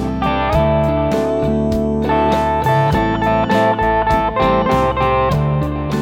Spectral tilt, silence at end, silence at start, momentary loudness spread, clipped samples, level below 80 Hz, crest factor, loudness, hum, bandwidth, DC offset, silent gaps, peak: -7.5 dB/octave; 0 s; 0 s; 3 LU; under 0.1%; -28 dBFS; 12 dB; -16 LUFS; none; 17 kHz; under 0.1%; none; -2 dBFS